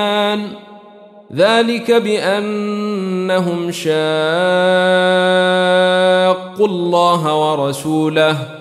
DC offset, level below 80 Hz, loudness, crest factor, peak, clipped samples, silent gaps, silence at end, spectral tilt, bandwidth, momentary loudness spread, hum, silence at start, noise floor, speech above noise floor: under 0.1%; -64 dBFS; -14 LUFS; 14 dB; -2 dBFS; under 0.1%; none; 0 s; -5 dB/octave; 14 kHz; 7 LU; none; 0 s; -40 dBFS; 26 dB